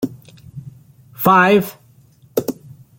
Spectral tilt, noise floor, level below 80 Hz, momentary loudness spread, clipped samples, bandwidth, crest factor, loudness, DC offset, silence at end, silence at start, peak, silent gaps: -6 dB/octave; -50 dBFS; -58 dBFS; 26 LU; under 0.1%; 17 kHz; 18 dB; -16 LUFS; under 0.1%; 0.45 s; 0 s; -2 dBFS; none